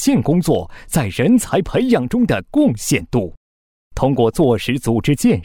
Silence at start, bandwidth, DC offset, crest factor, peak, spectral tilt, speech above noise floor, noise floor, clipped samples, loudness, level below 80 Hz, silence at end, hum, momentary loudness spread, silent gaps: 0 s; 17 kHz; under 0.1%; 14 dB; -4 dBFS; -6 dB/octave; over 74 dB; under -90 dBFS; under 0.1%; -17 LUFS; -38 dBFS; 0 s; none; 6 LU; 3.37-3.91 s